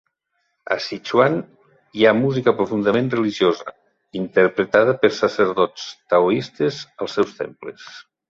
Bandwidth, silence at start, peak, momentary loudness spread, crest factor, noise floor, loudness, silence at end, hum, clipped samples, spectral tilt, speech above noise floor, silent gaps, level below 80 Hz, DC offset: 7.6 kHz; 0.7 s; -2 dBFS; 16 LU; 18 dB; -72 dBFS; -19 LUFS; 0.3 s; none; under 0.1%; -6 dB/octave; 53 dB; none; -60 dBFS; under 0.1%